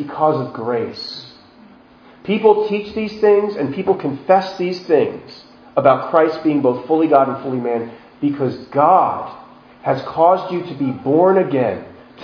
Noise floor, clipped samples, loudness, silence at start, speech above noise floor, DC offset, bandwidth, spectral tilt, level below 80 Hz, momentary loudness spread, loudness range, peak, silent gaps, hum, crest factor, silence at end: -45 dBFS; under 0.1%; -17 LUFS; 0 s; 29 dB; under 0.1%; 5.4 kHz; -8 dB/octave; -60 dBFS; 12 LU; 2 LU; 0 dBFS; none; none; 18 dB; 0 s